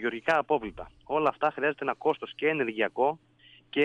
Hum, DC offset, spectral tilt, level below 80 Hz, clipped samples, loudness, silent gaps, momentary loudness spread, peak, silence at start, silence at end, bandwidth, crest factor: none; under 0.1%; -6 dB/octave; -62 dBFS; under 0.1%; -28 LUFS; none; 7 LU; -12 dBFS; 0 s; 0 s; 9 kHz; 16 dB